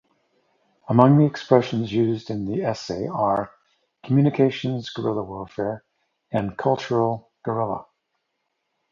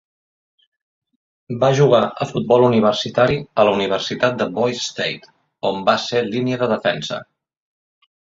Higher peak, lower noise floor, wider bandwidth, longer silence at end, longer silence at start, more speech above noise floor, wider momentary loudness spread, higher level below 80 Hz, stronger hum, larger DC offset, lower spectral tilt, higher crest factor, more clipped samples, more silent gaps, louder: about the same, 0 dBFS vs 0 dBFS; second, -76 dBFS vs under -90 dBFS; about the same, 7.4 kHz vs 7.8 kHz; about the same, 1.1 s vs 1.05 s; second, 0.9 s vs 1.5 s; second, 55 dB vs over 72 dB; about the same, 11 LU vs 10 LU; about the same, -58 dBFS vs -56 dBFS; neither; neither; first, -8 dB/octave vs -5.5 dB/octave; first, 24 dB vs 18 dB; neither; neither; second, -23 LUFS vs -18 LUFS